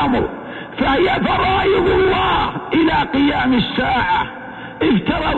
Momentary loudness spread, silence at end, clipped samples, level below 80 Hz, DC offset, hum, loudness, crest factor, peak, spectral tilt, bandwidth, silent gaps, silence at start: 10 LU; 0 s; under 0.1%; -34 dBFS; under 0.1%; none; -16 LUFS; 12 dB; -4 dBFS; -7.5 dB/octave; 7.8 kHz; none; 0 s